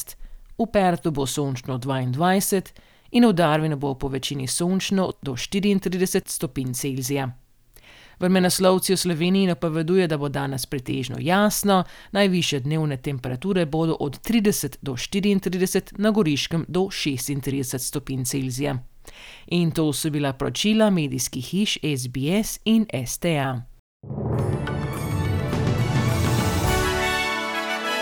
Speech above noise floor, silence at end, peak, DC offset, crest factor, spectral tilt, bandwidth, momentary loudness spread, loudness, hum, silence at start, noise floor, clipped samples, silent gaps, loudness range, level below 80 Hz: 29 dB; 0 s; -4 dBFS; under 0.1%; 20 dB; -5 dB/octave; over 20 kHz; 8 LU; -23 LUFS; none; 0 s; -51 dBFS; under 0.1%; 23.79-24.00 s; 3 LU; -42 dBFS